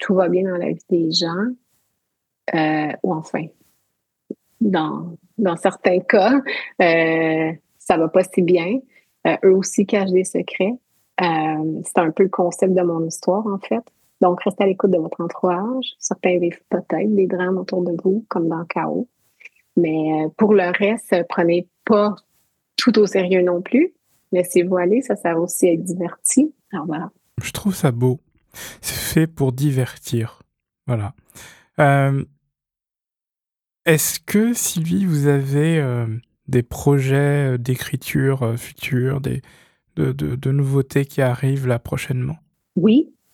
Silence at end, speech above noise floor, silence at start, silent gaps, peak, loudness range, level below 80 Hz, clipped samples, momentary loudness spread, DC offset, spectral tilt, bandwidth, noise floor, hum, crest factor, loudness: 0.3 s; 70 dB; 0 s; none; -2 dBFS; 4 LU; -54 dBFS; under 0.1%; 11 LU; under 0.1%; -5.5 dB/octave; 18.5 kHz; -89 dBFS; none; 18 dB; -19 LUFS